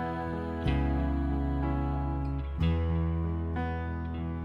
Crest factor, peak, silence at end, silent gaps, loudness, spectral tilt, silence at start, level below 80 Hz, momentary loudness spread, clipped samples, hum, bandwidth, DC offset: 16 dB; -14 dBFS; 0 s; none; -32 LUFS; -9.5 dB/octave; 0 s; -34 dBFS; 5 LU; under 0.1%; none; 5 kHz; under 0.1%